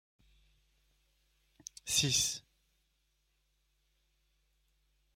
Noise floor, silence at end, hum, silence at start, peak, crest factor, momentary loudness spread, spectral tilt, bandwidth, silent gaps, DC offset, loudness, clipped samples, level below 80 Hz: -78 dBFS; 2.75 s; none; 1.85 s; -16 dBFS; 26 dB; 19 LU; -1.5 dB/octave; 16 kHz; none; under 0.1%; -30 LUFS; under 0.1%; -66 dBFS